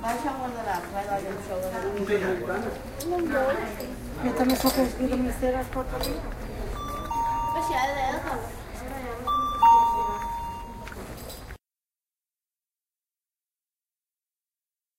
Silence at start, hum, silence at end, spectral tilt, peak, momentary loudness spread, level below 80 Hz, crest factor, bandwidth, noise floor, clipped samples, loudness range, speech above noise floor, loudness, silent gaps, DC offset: 0 s; none; 3.4 s; -5 dB/octave; -8 dBFS; 15 LU; -42 dBFS; 20 dB; 16.5 kHz; under -90 dBFS; under 0.1%; 12 LU; over 62 dB; -27 LUFS; none; under 0.1%